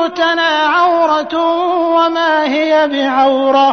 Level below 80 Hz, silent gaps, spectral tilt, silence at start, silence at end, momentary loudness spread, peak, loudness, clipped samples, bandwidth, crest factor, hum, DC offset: -58 dBFS; none; -3 dB/octave; 0 s; 0 s; 3 LU; -2 dBFS; -12 LUFS; under 0.1%; 6.6 kHz; 10 dB; none; 0.2%